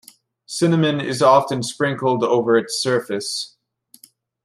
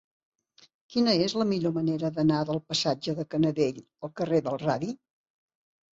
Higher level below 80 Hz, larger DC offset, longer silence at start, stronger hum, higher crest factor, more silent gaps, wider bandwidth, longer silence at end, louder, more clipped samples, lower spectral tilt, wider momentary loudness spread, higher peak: about the same, -66 dBFS vs -66 dBFS; neither; second, 0.5 s vs 0.9 s; neither; about the same, 18 dB vs 16 dB; neither; first, 15 kHz vs 8 kHz; about the same, 1 s vs 1 s; first, -19 LUFS vs -27 LUFS; neither; about the same, -5 dB/octave vs -6 dB/octave; about the same, 11 LU vs 9 LU; first, -2 dBFS vs -12 dBFS